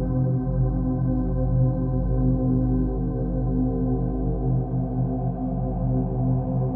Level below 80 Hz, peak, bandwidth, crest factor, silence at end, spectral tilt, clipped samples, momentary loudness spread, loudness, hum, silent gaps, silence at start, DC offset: -30 dBFS; -10 dBFS; 1.7 kHz; 12 dB; 0 s; -14.5 dB/octave; under 0.1%; 4 LU; -24 LUFS; none; none; 0 s; under 0.1%